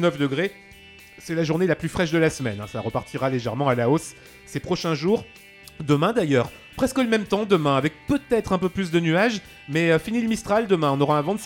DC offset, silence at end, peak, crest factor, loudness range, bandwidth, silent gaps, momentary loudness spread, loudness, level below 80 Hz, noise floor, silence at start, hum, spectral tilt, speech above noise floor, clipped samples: under 0.1%; 0 s; -4 dBFS; 18 dB; 3 LU; 17 kHz; none; 9 LU; -23 LUFS; -50 dBFS; -47 dBFS; 0 s; none; -6 dB/octave; 24 dB; under 0.1%